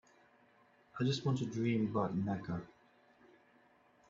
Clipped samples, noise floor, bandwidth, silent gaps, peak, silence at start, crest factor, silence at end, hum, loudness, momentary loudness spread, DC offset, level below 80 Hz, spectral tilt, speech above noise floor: under 0.1%; -68 dBFS; 7.8 kHz; none; -20 dBFS; 0.95 s; 18 dB; 1.4 s; none; -37 LUFS; 10 LU; under 0.1%; -72 dBFS; -6.5 dB/octave; 33 dB